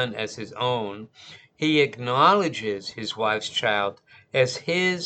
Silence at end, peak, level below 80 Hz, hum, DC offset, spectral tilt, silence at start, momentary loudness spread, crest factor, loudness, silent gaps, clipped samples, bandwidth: 0 s; -4 dBFS; -68 dBFS; none; under 0.1%; -4.5 dB/octave; 0 s; 13 LU; 22 dB; -24 LUFS; none; under 0.1%; 9 kHz